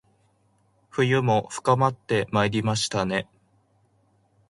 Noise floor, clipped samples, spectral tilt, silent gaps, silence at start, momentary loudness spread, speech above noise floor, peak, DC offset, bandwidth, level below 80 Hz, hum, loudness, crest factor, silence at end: -65 dBFS; under 0.1%; -5 dB/octave; none; 0.95 s; 7 LU; 42 dB; -6 dBFS; under 0.1%; 11.5 kHz; -58 dBFS; none; -24 LUFS; 20 dB; 1.25 s